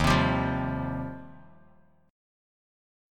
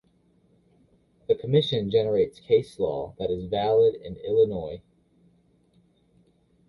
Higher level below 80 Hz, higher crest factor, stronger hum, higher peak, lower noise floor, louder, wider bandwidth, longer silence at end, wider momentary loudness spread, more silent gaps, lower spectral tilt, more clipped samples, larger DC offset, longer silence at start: first, -42 dBFS vs -56 dBFS; about the same, 22 dB vs 18 dB; neither; about the same, -10 dBFS vs -8 dBFS; about the same, -61 dBFS vs -64 dBFS; second, -28 LUFS vs -25 LUFS; first, 16.5 kHz vs 11 kHz; second, 1 s vs 1.9 s; first, 21 LU vs 13 LU; neither; second, -6 dB/octave vs -7.5 dB/octave; neither; neither; second, 0 s vs 1.3 s